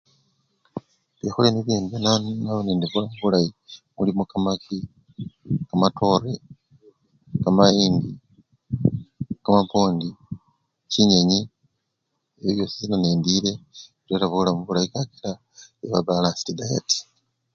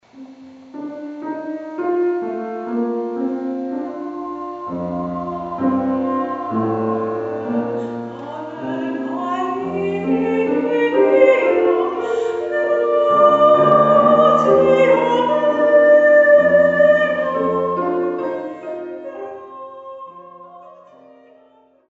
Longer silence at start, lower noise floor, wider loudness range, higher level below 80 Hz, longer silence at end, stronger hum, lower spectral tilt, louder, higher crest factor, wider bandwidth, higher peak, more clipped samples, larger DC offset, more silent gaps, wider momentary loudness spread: first, 0.75 s vs 0.15 s; first, -77 dBFS vs -53 dBFS; second, 3 LU vs 12 LU; first, -52 dBFS vs -58 dBFS; second, 0.55 s vs 1.15 s; neither; about the same, -5.5 dB/octave vs -4.5 dB/octave; second, -22 LUFS vs -17 LUFS; first, 24 dB vs 18 dB; about the same, 7.6 kHz vs 7.8 kHz; about the same, 0 dBFS vs 0 dBFS; neither; neither; neither; about the same, 20 LU vs 18 LU